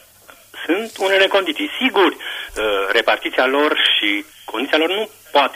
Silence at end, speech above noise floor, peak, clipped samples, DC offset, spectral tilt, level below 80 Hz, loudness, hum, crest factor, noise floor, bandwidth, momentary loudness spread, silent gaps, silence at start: 0 s; 28 dB; -4 dBFS; under 0.1%; under 0.1%; -2 dB/octave; -52 dBFS; -17 LUFS; none; 14 dB; -46 dBFS; 15.5 kHz; 10 LU; none; 0.55 s